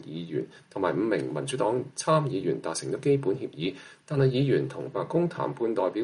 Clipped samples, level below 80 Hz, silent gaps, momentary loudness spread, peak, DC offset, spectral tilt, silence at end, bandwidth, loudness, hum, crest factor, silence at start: under 0.1%; -68 dBFS; none; 9 LU; -12 dBFS; under 0.1%; -6 dB/octave; 0 s; 11.5 kHz; -28 LUFS; none; 16 dB; 0 s